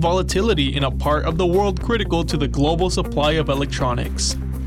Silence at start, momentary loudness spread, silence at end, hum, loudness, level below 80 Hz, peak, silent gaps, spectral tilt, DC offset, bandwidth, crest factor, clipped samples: 0 s; 3 LU; 0 s; none; -20 LUFS; -26 dBFS; -6 dBFS; none; -5 dB/octave; under 0.1%; 15 kHz; 14 dB; under 0.1%